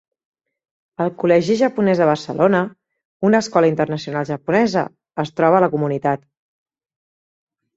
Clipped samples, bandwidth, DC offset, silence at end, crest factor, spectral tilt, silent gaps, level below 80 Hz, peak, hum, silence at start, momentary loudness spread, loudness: under 0.1%; 8 kHz; under 0.1%; 1.6 s; 18 dB; -6.5 dB/octave; 3.05-3.20 s; -60 dBFS; -2 dBFS; none; 1 s; 9 LU; -18 LUFS